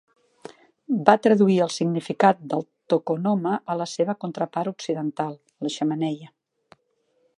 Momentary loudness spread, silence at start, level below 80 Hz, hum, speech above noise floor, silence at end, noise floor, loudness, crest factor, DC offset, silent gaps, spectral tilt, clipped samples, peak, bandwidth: 12 LU; 0.9 s; -76 dBFS; none; 46 dB; 1.1 s; -69 dBFS; -23 LUFS; 22 dB; under 0.1%; none; -6 dB/octave; under 0.1%; -2 dBFS; 11 kHz